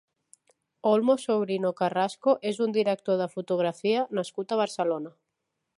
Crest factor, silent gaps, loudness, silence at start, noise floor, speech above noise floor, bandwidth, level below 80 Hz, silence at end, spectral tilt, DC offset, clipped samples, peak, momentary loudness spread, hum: 18 dB; none; -27 LUFS; 0.85 s; -82 dBFS; 56 dB; 11.5 kHz; -82 dBFS; 0.7 s; -5.5 dB/octave; under 0.1%; under 0.1%; -10 dBFS; 6 LU; none